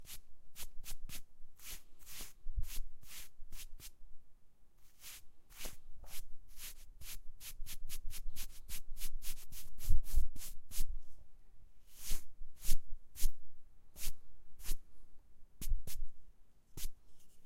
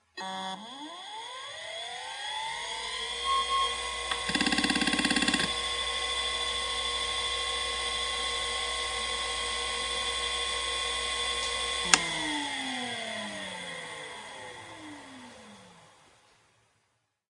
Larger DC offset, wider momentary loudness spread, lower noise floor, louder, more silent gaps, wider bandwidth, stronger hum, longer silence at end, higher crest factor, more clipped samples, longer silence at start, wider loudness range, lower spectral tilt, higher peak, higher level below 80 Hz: neither; about the same, 13 LU vs 15 LU; second, -55 dBFS vs -76 dBFS; second, -48 LUFS vs -30 LUFS; neither; first, 16 kHz vs 11.5 kHz; neither; second, 0 s vs 1.4 s; second, 20 dB vs 32 dB; neither; second, 0 s vs 0.15 s; second, 8 LU vs 11 LU; first, -2.5 dB/octave vs -1 dB/octave; second, -14 dBFS vs 0 dBFS; first, -40 dBFS vs -52 dBFS